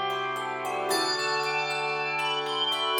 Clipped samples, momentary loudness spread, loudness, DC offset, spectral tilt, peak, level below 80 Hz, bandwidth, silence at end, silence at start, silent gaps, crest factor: under 0.1%; 5 LU; -27 LUFS; under 0.1%; -2 dB/octave; -14 dBFS; -72 dBFS; 18 kHz; 0 s; 0 s; none; 16 dB